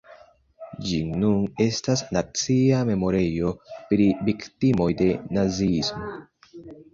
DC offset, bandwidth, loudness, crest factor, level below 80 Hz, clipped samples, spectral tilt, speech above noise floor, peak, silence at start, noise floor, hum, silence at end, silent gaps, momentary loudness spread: under 0.1%; 7.6 kHz; -23 LUFS; 16 dB; -46 dBFS; under 0.1%; -6 dB/octave; 29 dB; -6 dBFS; 0.1 s; -52 dBFS; none; 0.1 s; none; 14 LU